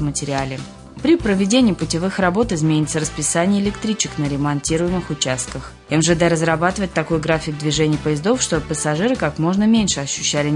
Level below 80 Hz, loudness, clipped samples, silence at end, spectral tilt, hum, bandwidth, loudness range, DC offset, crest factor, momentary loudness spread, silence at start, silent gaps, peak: -40 dBFS; -18 LUFS; under 0.1%; 0 s; -4.5 dB/octave; none; 11 kHz; 2 LU; under 0.1%; 16 dB; 6 LU; 0 s; none; -2 dBFS